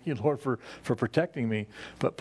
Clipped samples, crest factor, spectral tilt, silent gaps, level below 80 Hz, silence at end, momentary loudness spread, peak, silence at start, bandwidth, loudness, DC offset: under 0.1%; 22 dB; -7.5 dB/octave; none; -64 dBFS; 0 s; 6 LU; -10 dBFS; 0.05 s; 11 kHz; -31 LUFS; under 0.1%